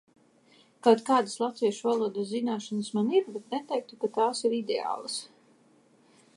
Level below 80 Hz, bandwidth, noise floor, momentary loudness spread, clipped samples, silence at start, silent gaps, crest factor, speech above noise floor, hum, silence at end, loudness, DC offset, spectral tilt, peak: -86 dBFS; 11.5 kHz; -62 dBFS; 10 LU; under 0.1%; 0.85 s; none; 22 dB; 34 dB; none; 1.1 s; -29 LUFS; under 0.1%; -4.5 dB/octave; -6 dBFS